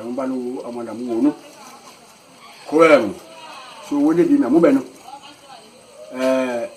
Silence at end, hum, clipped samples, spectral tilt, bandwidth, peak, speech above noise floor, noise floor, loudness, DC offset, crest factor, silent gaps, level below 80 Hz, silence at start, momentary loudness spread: 0 s; none; under 0.1%; -6 dB/octave; 14 kHz; 0 dBFS; 29 dB; -46 dBFS; -18 LUFS; under 0.1%; 20 dB; none; -66 dBFS; 0 s; 25 LU